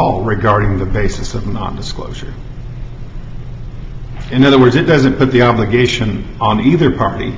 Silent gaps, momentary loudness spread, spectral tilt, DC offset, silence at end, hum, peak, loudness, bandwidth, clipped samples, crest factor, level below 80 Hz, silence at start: none; 20 LU; -6.5 dB/octave; under 0.1%; 0 s; none; 0 dBFS; -13 LUFS; 7.8 kHz; under 0.1%; 14 dB; -28 dBFS; 0 s